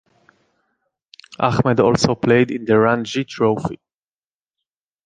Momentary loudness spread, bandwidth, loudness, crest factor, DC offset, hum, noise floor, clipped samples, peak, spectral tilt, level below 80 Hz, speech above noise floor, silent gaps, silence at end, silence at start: 9 LU; 9.4 kHz; -18 LUFS; 18 dB; under 0.1%; none; under -90 dBFS; under 0.1%; -2 dBFS; -6 dB/octave; -50 dBFS; over 73 dB; none; 1.3 s; 1.4 s